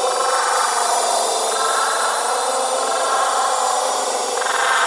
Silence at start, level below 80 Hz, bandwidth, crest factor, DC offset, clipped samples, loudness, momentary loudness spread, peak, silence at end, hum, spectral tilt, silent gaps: 0 s; -84 dBFS; 11.5 kHz; 14 dB; under 0.1%; under 0.1%; -18 LUFS; 2 LU; -4 dBFS; 0 s; none; 2 dB/octave; none